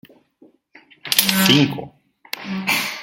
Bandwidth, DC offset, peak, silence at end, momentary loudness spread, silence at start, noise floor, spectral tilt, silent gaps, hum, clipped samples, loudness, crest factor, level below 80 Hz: 17 kHz; under 0.1%; 0 dBFS; 0 s; 19 LU; 1.05 s; -54 dBFS; -3 dB/octave; none; none; under 0.1%; -17 LUFS; 22 dB; -60 dBFS